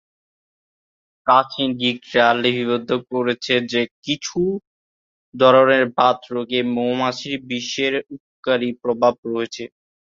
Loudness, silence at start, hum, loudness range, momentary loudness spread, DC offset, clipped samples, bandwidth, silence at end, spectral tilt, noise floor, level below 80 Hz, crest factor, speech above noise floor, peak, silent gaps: -19 LUFS; 1.25 s; none; 3 LU; 11 LU; under 0.1%; under 0.1%; 7.6 kHz; 0.4 s; -4.5 dB/octave; under -90 dBFS; -62 dBFS; 18 dB; over 71 dB; -2 dBFS; 3.91-4.02 s, 4.67-5.32 s, 8.20-8.43 s, 9.18-9.23 s